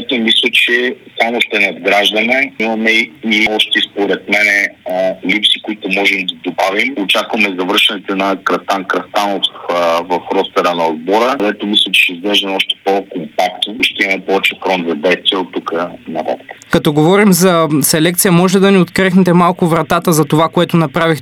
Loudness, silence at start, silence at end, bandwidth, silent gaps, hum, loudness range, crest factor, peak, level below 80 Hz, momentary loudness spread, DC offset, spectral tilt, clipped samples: -12 LUFS; 0 s; 0 s; 18.5 kHz; none; none; 4 LU; 12 dB; 0 dBFS; -52 dBFS; 7 LU; under 0.1%; -4 dB/octave; under 0.1%